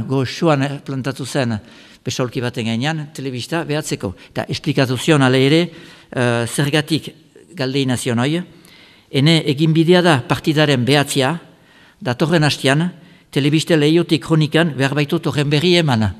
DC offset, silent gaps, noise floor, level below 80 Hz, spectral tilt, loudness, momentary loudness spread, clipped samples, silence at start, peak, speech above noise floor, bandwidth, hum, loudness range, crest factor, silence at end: under 0.1%; none; -48 dBFS; -52 dBFS; -5.5 dB/octave; -17 LUFS; 11 LU; under 0.1%; 0 s; 0 dBFS; 32 dB; 14.5 kHz; none; 6 LU; 18 dB; 0 s